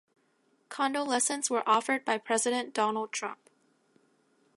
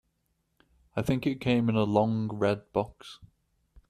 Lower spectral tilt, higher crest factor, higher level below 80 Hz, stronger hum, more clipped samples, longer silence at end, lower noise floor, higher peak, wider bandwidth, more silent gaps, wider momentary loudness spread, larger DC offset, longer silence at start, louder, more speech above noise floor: second, -1.5 dB/octave vs -7.5 dB/octave; about the same, 20 dB vs 20 dB; second, -88 dBFS vs -58 dBFS; neither; neither; first, 1.2 s vs 0.65 s; second, -71 dBFS vs -76 dBFS; about the same, -12 dBFS vs -10 dBFS; second, 11.5 kHz vs 13.5 kHz; neither; second, 9 LU vs 13 LU; neither; second, 0.7 s vs 0.95 s; about the same, -29 LUFS vs -28 LUFS; second, 41 dB vs 48 dB